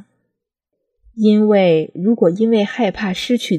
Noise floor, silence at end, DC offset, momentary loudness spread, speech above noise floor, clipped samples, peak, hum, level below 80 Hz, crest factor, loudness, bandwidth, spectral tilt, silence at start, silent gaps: -77 dBFS; 0 s; under 0.1%; 7 LU; 62 dB; under 0.1%; -2 dBFS; none; -54 dBFS; 14 dB; -15 LUFS; 11 kHz; -6.5 dB/octave; 1.15 s; none